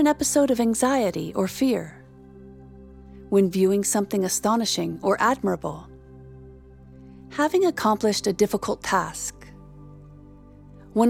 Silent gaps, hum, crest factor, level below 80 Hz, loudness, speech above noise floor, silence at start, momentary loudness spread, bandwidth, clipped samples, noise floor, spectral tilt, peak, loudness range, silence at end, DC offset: none; none; 18 dB; -52 dBFS; -23 LUFS; 24 dB; 0 s; 10 LU; 17.5 kHz; under 0.1%; -47 dBFS; -4 dB/octave; -6 dBFS; 3 LU; 0 s; under 0.1%